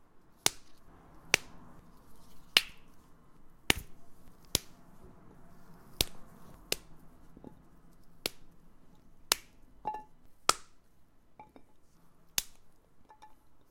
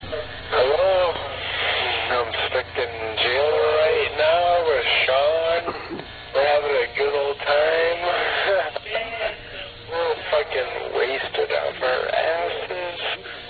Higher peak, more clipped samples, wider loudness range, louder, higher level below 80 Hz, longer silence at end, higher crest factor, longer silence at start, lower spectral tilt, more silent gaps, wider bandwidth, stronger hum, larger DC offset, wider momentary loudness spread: first, -2 dBFS vs -8 dBFS; neither; first, 7 LU vs 4 LU; second, -33 LUFS vs -22 LUFS; second, -56 dBFS vs -50 dBFS; about the same, 0 s vs 0 s; first, 38 dB vs 16 dB; about the same, 0 s vs 0 s; second, -0.5 dB/octave vs -5.5 dB/octave; neither; first, 16.5 kHz vs 4.8 kHz; second, none vs 60 Hz at -55 dBFS; neither; first, 27 LU vs 9 LU